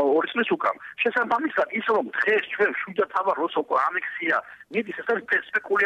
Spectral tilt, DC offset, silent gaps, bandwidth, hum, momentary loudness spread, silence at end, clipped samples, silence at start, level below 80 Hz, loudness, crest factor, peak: -5.5 dB/octave; under 0.1%; none; 8.4 kHz; none; 5 LU; 0 s; under 0.1%; 0 s; -72 dBFS; -24 LUFS; 14 dB; -10 dBFS